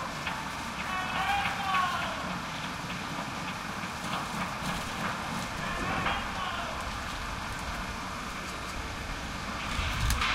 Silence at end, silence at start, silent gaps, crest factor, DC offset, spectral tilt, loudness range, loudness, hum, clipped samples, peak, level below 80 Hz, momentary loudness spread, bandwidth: 0 s; 0 s; none; 22 dB; under 0.1%; -3.5 dB/octave; 3 LU; -33 LUFS; none; under 0.1%; -12 dBFS; -44 dBFS; 8 LU; 16 kHz